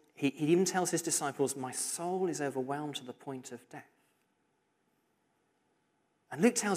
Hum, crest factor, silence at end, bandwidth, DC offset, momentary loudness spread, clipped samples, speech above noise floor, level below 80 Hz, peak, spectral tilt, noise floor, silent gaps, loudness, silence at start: none; 20 dB; 0 s; 15.5 kHz; under 0.1%; 18 LU; under 0.1%; 44 dB; -86 dBFS; -14 dBFS; -4 dB/octave; -77 dBFS; none; -33 LUFS; 0.2 s